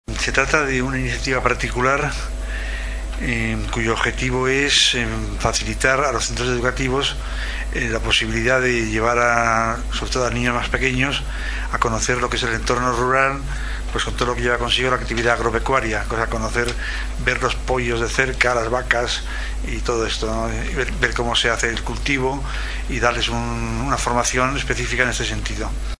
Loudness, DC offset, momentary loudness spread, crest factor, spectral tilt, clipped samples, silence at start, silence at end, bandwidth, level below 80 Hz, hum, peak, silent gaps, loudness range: -20 LUFS; under 0.1%; 9 LU; 20 dB; -3.5 dB/octave; under 0.1%; 0.1 s; 0.05 s; 11 kHz; -28 dBFS; none; 0 dBFS; none; 3 LU